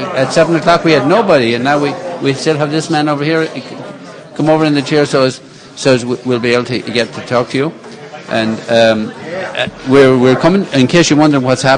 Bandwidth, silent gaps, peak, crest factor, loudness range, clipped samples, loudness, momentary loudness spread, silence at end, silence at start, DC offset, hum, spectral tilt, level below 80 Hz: 10.5 kHz; none; 0 dBFS; 12 dB; 4 LU; 0.2%; -12 LUFS; 13 LU; 0 s; 0 s; under 0.1%; none; -5.5 dB/octave; -48 dBFS